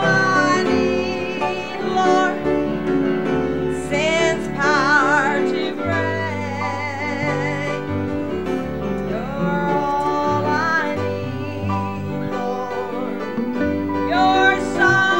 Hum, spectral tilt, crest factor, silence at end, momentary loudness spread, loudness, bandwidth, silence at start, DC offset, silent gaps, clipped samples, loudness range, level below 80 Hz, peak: none; -5.5 dB/octave; 18 dB; 0 s; 9 LU; -20 LUFS; 16 kHz; 0 s; 1%; none; under 0.1%; 5 LU; -46 dBFS; -2 dBFS